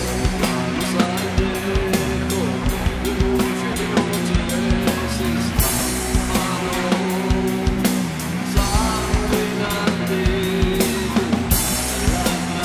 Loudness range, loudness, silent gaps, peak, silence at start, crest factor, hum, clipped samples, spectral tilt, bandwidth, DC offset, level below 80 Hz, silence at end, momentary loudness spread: 1 LU; -20 LUFS; none; -2 dBFS; 0 s; 16 dB; none; under 0.1%; -4.5 dB/octave; 16 kHz; under 0.1%; -26 dBFS; 0 s; 3 LU